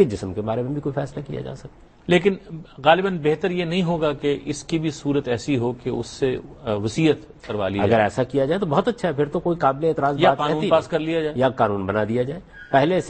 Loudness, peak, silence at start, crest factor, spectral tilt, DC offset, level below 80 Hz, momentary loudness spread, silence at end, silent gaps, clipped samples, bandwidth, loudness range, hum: -22 LUFS; -2 dBFS; 0 s; 20 dB; -6.5 dB/octave; under 0.1%; -50 dBFS; 10 LU; 0 s; none; under 0.1%; 8.8 kHz; 3 LU; none